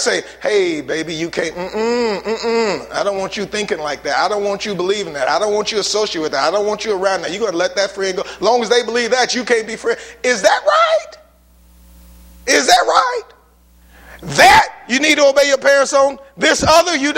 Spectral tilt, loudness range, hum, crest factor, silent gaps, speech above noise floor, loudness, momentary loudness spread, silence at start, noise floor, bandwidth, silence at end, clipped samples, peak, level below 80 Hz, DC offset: -2.5 dB/octave; 6 LU; none; 16 dB; none; 34 dB; -15 LUFS; 10 LU; 0 s; -49 dBFS; 16.5 kHz; 0 s; under 0.1%; 0 dBFS; -46 dBFS; under 0.1%